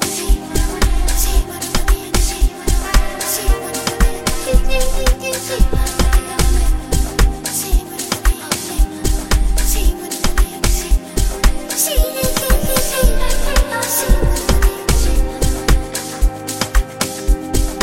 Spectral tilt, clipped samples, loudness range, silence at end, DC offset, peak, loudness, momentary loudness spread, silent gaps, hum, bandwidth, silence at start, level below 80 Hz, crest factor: -3.5 dB/octave; under 0.1%; 2 LU; 0 s; 3%; 0 dBFS; -18 LUFS; 4 LU; none; none; 17 kHz; 0 s; -16 dBFS; 14 dB